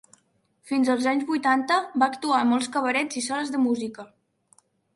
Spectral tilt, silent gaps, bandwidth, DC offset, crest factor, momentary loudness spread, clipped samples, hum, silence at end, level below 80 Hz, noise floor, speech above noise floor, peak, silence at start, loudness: -3 dB/octave; none; 11.5 kHz; under 0.1%; 18 dB; 7 LU; under 0.1%; none; 0.9 s; -74 dBFS; -67 dBFS; 44 dB; -6 dBFS; 0.65 s; -24 LUFS